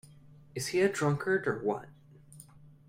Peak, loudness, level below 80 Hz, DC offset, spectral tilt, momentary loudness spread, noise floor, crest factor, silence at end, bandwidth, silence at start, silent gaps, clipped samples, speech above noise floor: -14 dBFS; -31 LUFS; -68 dBFS; under 0.1%; -5.5 dB/octave; 19 LU; -55 dBFS; 20 dB; 0.25 s; 16 kHz; 0.1 s; none; under 0.1%; 25 dB